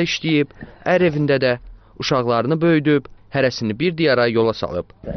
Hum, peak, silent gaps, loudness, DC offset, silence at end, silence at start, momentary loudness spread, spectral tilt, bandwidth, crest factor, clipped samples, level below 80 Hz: none; -6 dBFS; none; -19 LUFS; under 0.1%; 0 s; 0 s; 10 LU; -4.5 dB/octave; 6.4 kHz; 14 dB; under 0.1%; -46 dBFS